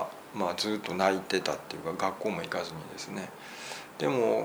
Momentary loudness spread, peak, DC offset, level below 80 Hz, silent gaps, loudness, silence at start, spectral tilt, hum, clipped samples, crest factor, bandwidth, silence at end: 12 LU; -10 dBFS; under 0.1%; -70 dBFS; none; -32 LUFS; 0 s; -4 dB/octave; none; under 0.1%; 22 dB; over 20 kHz; 0 s